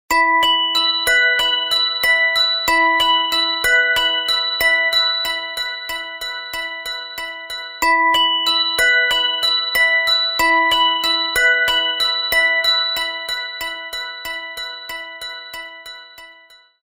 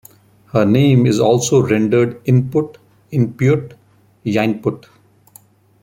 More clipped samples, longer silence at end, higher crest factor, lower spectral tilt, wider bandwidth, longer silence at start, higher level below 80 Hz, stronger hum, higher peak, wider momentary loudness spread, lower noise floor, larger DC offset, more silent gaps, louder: neither; second, 0.5 s vs 1.05 s; about the same, 14 dB vs 16 dB; second, 0.5 dB/octave vs -6.5 dB/octave; about the same, 16.5 kHz vs 16 kHz; second, 0.1 s vs 0.55 s; about the same, -48 dBFS vs -52 dBFS; neither; second, -4 dBFS vs 0 dBFS; first, 14 LU vs 11 LU; about the same, -48 dBFS vs -48 dBFS; neither; neither; about the same, -15 LUFS vs -16 LUFS